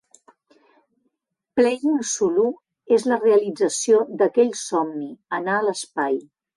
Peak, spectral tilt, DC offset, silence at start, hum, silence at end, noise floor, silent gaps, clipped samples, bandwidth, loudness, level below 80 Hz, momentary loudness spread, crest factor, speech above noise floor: -6 dBFS; -3.5 dB/octave; under 0.1%; 1.55 s; none; 0.35 s; -75 dBFS; none; under 0.1%; 11.5 kHz; -21 LUFS; -70 dBFS; 10 LU; 16 dB; 55 dB